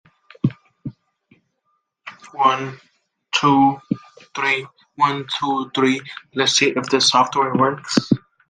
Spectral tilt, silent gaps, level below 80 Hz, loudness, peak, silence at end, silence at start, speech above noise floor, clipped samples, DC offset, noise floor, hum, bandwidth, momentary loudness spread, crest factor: -3.5 dB/octave; none; -62 dBFS; -19 LUFS; -2 dBFS; 0.3 s; 0.45 s; 52 dB; under 0.1%; under 0.1%; -70 dBFS; none; 10 kHz; 21 LU; 20 dB